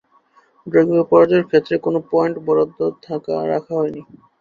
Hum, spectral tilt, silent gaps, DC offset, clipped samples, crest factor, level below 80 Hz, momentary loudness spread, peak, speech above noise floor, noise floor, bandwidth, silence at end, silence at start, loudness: none; -8.5 dB/octave; none; under 0.1%; under 0.1%; 18 dB; -60 dBFS; 11 LU; 0 dBFS; 38 dB; -55 dBFS; 6.8 kHz; 0.4 s; 0.65 s; -18 LUFS